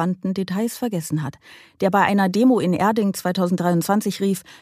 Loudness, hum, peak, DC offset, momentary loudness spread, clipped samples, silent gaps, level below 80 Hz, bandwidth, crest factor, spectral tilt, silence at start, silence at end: -20 LUFS; none; -2 dBFS; under 0.1%; 8 LU; under 0.1%; none; -64 dBFS; 15.5 kHz; 18 dB; -6 dB/octave; 0 s; 0.05 s